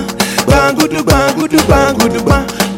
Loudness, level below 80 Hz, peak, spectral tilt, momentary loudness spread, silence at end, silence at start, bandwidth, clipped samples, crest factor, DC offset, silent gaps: -11 LUFS; -22 dBFS; 0 dBFS; -4.5 dB/octave; 4 LU; 0 s; 0 s; 17 kHz; under 0.1%; 10 dB; under 0.1%; none